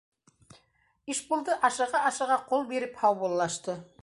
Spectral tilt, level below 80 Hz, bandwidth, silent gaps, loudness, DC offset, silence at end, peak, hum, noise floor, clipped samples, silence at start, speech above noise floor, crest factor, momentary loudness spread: -3 dB/octave; -72 dBFS; 11.5 kHz; none; -28 LUFS; under 0.1%; 0.2 s; -10 dBFS; none; -69 dBFS; under 0.1%; 1.05 s; 40 dB; 20 dB; 9 LU